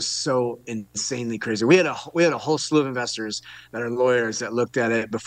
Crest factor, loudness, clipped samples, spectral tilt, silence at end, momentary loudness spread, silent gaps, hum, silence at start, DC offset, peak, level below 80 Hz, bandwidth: 18 dB; -23 LUFS; under 0.1%; -4 dB/octave; 0 s; 12 LU; none; none; 0 s; under 0.1%; -6 dBFS; -66 dBFS; 10 kHz